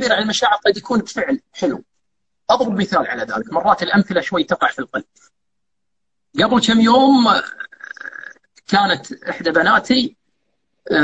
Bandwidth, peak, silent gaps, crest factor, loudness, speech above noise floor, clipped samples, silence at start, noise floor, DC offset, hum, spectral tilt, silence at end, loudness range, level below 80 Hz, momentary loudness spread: 8.6 kHz; 0 dBFS; none; 18 dB; -17 LUFS; 64 dB; under 0.1%; 0 s; -80 dBFS; under 0.1%; none; -4.5 dB/octave; 0 s; 4 LU; -54 dBFS; 18 LU